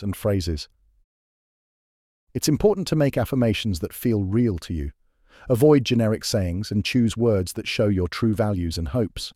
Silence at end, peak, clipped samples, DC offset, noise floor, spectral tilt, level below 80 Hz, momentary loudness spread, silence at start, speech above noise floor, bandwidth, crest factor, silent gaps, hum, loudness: 0.05 s; -4 dBFS; under 0.1%; under 0.1%; under -90 dBFS; -6 dB/octave; -40 dBFS; 10 LU; 0 s; over 68 dB; 16.5 kHz; 18 dB; 1.04-2.27 s; none; -23 LUFS